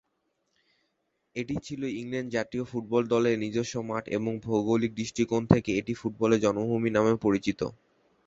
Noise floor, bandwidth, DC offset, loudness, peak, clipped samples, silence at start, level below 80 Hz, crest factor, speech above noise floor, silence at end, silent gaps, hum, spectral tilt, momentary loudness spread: -77 dBFS; 7.8 kHz; under 0.1%; -28 LUFS; -2 dBFS; under 0.1%; 1.35 s; -56 dBFS; 26 dB; 49 dB; 0.55 s; none; none; -6.5 dB/octave; 10 LU